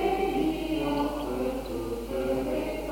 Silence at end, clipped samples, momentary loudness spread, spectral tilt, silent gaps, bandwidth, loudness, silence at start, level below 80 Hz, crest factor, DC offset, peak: 0 s; under 0.1%; 6 LU; -6 dB/octave; none; 17 kHz; -30 LUFS; 0 s; -42 dBFS; 14 dB; under 0.1%; -14 dBFS